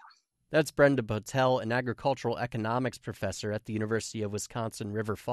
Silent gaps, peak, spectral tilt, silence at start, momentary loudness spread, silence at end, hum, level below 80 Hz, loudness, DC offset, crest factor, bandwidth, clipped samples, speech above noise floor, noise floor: none; -10 dBFS; -5.5 dB/octave; 0.05 s; 10 LU; 0 s; none; -60 dBFS; -30 LUFS; under 0.1%; 20 dB; 13 kHz; under 0.1%; 30 dB; -60 dBFS